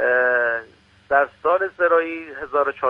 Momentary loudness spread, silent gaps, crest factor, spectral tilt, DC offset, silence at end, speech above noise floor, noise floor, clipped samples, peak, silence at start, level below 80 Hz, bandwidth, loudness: 10 LU; none; 16 dB; -6 dB/octave; under 0.1%; 0 s; 28 dB; -48 dBFS; under 0.1%; -4 dBFS; 0 s; -60 dBFS; 5.2 kHz; -20 LUFS